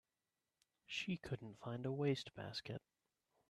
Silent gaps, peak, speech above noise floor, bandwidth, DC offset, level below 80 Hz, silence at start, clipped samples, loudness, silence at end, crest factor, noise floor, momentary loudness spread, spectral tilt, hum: none; -28 dBFS; over 45 dB; 12.5 kHz; under 0.1%; -76 dBFS; 0.9 s; under 0.1%; -45 LUFS; 0.7 s; 20 dB; under -90 dBFS; 9 LU; -6 dB/octave; none